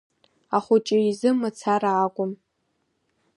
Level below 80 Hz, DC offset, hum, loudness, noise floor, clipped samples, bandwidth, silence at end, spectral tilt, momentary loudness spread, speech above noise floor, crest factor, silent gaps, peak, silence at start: -76 dBFS; under 0.1%; none; -23 LUFS; -73 dBFS; under 0.1%; 11 kHz; 1 s; -6 dB/octave; 9 LU; 51 dB; 18 dB; none; -8 dBFS; 0.5 s